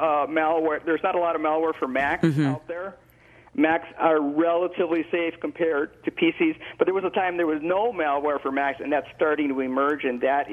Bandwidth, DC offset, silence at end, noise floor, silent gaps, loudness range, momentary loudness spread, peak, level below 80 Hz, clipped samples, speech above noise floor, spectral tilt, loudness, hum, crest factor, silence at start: 9.6 kHz; under 0.1%; 0 s; -53 dBFS; none; 1 LU; 5 LU; -6 dBFS; -62 dBFS; under 0.1%; 29 dB; -7.5 dB/octave; -24 LUFS; none; 18 dB; 0 s